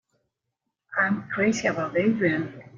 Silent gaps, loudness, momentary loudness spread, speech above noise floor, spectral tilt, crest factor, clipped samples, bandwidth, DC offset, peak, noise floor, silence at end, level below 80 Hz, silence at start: none; -25 LUFS; 4 LU; 57 dB; -5.5 dB/octave; 18 dB; under 0.1%; 7.6 kHz; under 0.1%; -10 dBFS; -82 dBFS; 0 s; -64 dBFS; 0.9 s